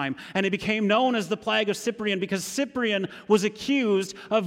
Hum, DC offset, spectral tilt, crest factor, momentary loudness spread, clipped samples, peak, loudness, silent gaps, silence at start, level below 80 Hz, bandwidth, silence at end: none; under 0.1%; -4.5 dB/octave; 16 dB; 5 LU; under 0.1%; -10 dBFS; -25 LUFS; none; 0 s; -64 dBFS; 16.5 kHz; 0 s